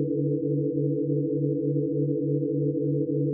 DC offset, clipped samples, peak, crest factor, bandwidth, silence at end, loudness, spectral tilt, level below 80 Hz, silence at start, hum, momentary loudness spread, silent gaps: under 0.1%; under 0.1%; -14 dBFS; 12 dB; 0.6 kHz; 0 s; -26 LUFS; -20.5 dB/octave; -70 dBFS; 0 s; none; 1 LU; none